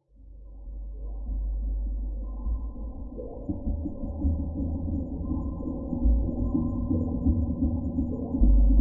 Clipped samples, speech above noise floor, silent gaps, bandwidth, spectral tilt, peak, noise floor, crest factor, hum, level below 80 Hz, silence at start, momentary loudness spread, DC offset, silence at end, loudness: under 0.1%; 20 dB; none; 1.1 kHz; -15.5 dB/octave; -8 dBFS; -47 dBFS; 18 dB; none; -28 dBFS; 0.2 s; 13 LU; under 0.1%; 0 s; -30 LUFS